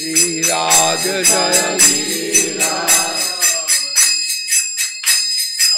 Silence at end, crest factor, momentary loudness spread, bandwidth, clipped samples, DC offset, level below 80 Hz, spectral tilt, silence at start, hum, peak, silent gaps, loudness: 0 s; 14 dB; 5 LU; 16.5 kHz; under 0.1%; under 0.1%; -58 dBFS; 0 dB/octave; 0 s; none; 0 dBFS; none; -12 LUFS